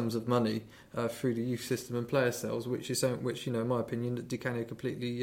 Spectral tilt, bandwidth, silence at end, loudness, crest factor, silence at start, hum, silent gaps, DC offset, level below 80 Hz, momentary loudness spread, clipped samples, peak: -5.5 dB/octave; 16.5 kHz; 0 s; -34 LUFS; 16 dB; 0 s; none; none; under 0.1%; -66 dBFS; 6 LU; under 0.1%; -16 dBFS